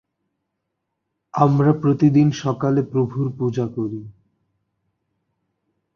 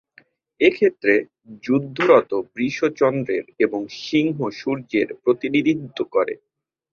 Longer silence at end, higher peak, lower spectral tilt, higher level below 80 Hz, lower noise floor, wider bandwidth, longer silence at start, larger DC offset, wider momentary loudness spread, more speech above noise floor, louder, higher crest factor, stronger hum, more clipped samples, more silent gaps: first, 1.85 s vs 0.6 s; about the same, -2 dBFS vs -2 dBFS; first, -8.5 dB/octave vs -6.5 dB/octave; first, -58 dBFS vs -64 dBFS; first, -78 dBFS vs -55 dBFS; about the same, 6.8 kHz vs 6.8 kHz; first, 1.35 s vs 0.6 s; neither; about the same, 12 LU vs 10 LU; first, 59 dB vs 35 dB; about the same, -19 LUFS vs -21 LUFS; about the same, 20 dB vs 20 dB; neither; neither; neither